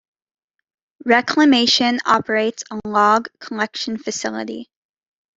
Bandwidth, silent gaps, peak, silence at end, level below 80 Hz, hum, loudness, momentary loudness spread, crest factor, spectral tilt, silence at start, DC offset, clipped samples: 8 kHz; none; -2 dBFS; 0.75 s; -62 dBFS; none; -17 LUFS; 16 LU; 18 dB; -3 dB/octave; 1.05 s; under 0.1%; under 0.1%